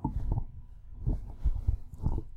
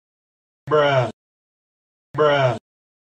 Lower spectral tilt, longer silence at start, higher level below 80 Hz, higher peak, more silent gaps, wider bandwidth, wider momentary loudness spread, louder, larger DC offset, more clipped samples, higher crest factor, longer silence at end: first, -10.5 dB/octave vs -6.5 dB/octave; second, 0 s vs 0.65 s; first, -34 dBFS vs -60 dBFS; second, -14 dBFS vs -6 dBFS; second, none vs 1.13-2.14 s; second, 1.9 kHz vs 9 kHz; about the same, 15 LU vs 13 LU; second, -36 LUFS vs -19 LUFS; neither; neither; about the same, 18 dB vs 18 dB; second, 0 s vs 0.45 s